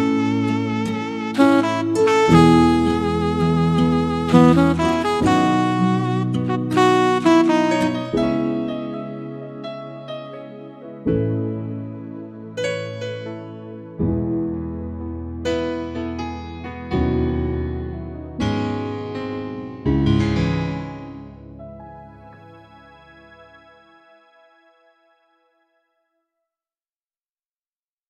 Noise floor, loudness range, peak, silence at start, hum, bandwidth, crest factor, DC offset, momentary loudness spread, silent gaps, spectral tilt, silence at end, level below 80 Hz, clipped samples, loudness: under -90 dBFS; 11 LU; 0 dBFS; 0 s; none; 12.5 kHz; 20 dB; under 0.1%; 18 LU; none; -7 dB/octave; 4.65 s; -38 dBFS; under 0.1%; -20 LUFS